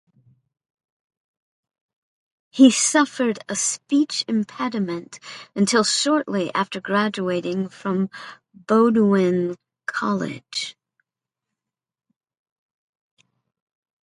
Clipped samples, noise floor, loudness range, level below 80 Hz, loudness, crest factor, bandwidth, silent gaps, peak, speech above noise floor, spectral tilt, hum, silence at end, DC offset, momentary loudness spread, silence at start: under 0.1%; -89 dBFS; 10 LU; -70 dBFS; -21 LUFS; 22 dB; 11.5 kHz; none; -2 dBFS; 68 dB; -4 dB/octave; none; 3.35 s; under 0.1%; 15 LU; 2.55 s